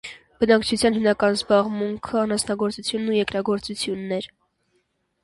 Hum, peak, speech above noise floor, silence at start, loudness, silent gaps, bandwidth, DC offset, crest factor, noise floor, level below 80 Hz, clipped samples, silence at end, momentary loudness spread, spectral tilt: none; -4 dBFS; 48 dB; 0.05 s; -22 LUFS; none; 11.5 kHz; under 0.1%; 18 dB; -70 dBFS; -54 dBFS; under 0.1%; 0.95 s; 9 LU; -4.5 dB/octave